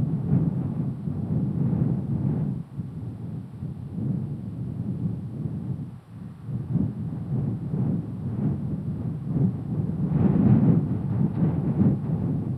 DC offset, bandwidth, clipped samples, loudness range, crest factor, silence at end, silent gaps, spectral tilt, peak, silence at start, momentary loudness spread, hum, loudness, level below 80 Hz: under 0.1%; 3.7 kHz; under 0.1%; 9 LU; 18 dB; 0 s; none; -12 dB/octave; -8 dBFS; 0 s; 13 LU; none; -27 LUFS; -48 dBFS